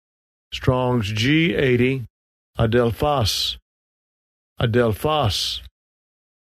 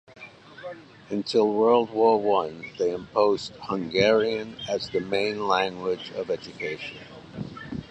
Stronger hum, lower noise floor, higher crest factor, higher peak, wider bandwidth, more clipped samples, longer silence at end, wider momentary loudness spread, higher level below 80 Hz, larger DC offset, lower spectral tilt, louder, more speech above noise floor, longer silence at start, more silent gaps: neither; first, under -90 dBFS vs -44 dBFS; about the same, 18 dB vs 20 dB; about the same, -4 dBFS vs -6 dBFS; first, 13.5 kHz vs 8.6 kHz; neither; first, 0.75 s vs 0.05 s; second, 12 LU vs 20 LU; first, -42 dBFS vs -60 dBFS; neither; about the same, -5.5 dB/octave vs -5.5 dB/octave; first, -20 LUFS vs -25 LUFS; first, over 70 dB vs 20 dB; first, 0.5 s vs 0.1 s; first, 2.10-2.54 s, 3.62-4.56 s vs none